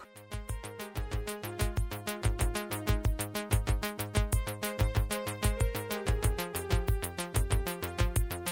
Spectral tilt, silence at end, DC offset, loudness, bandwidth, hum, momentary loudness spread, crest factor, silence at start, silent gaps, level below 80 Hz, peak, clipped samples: -4.5 dB/octave; 0 s; under 0.1%; -33 LUFS; 18 kHz; none; 7 LU; 18 dB; 0 s; none; -36 dBFS; -14 dBFS; under 0.1%